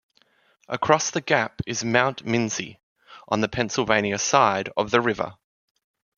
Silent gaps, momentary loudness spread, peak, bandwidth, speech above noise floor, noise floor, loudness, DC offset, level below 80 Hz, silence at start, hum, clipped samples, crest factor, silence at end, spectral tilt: 2.83-2.96 s; 9 LU; -2 dBFS; 10 kHz; 40 dB; -63 dBFS; -23 LUFS; under 0.1%; -58 dBFS; 0.7 s; none; under 0.1%; 22 dB; 0.85 s; -3.5 dB/octave